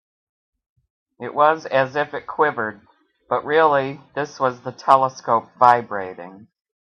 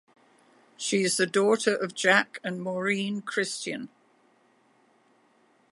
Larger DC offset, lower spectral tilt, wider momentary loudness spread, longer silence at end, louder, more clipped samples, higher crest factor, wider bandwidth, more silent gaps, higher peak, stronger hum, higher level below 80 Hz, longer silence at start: neither; first, -5.5 dB/octave vs -3 dB/octave; about the same, 13 LU vs 12 LU; second, 0.65 s vs 1.85 s; first, -20 LUFS vs -26 LUFS; neither; about the same, 22 dB vs 24 dB; about the same, 11 kHz vs 11.5 kHz; neither; first, 0 dBFS vs -6 dBFS; neither; first, -68 dBFS vs -82 dBFS; first, 1.2 s vs 0.8 s